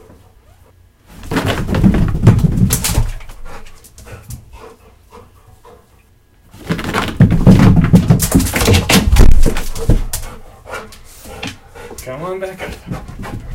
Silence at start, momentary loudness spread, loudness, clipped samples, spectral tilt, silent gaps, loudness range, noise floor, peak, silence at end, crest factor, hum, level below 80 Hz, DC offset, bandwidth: 1.25 s; 24 LU; -13 LUFS; 1%; -5.5 dB/octave; none; 16 LU; -49 dBFS; 0 dBFS; 0 s; 14 dB; none; -18 dBFS; under 0.1%; 17 kHz